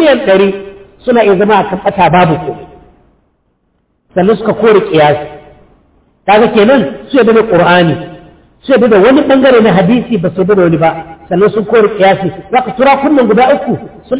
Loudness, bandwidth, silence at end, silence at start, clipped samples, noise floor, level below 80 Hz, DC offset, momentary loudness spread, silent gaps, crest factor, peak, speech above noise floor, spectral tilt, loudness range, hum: -8 LUFS; 4 kHz; 0 s; 0 s; under 0.1%; -58 dBFS; -42 dBFS; under 0.1%; 12 LU; none; 8 dB; 0 dBFS; 51 dB; -10.5 dB/octave; 5 LU; none